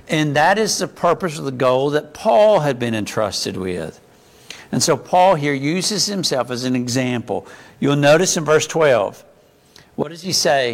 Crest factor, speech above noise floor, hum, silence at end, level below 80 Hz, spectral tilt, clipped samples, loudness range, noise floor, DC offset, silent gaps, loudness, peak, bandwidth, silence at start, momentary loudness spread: 14 dB; 32 dB; none; 0 s; -56 dBFS; -4 dB/octave; under 0.1%; 2 LU; -50 dBFS; under 0.1%; none; -18 LUFS; -4 dBFS; 16.5 kHz; 0.1 s; 12 LU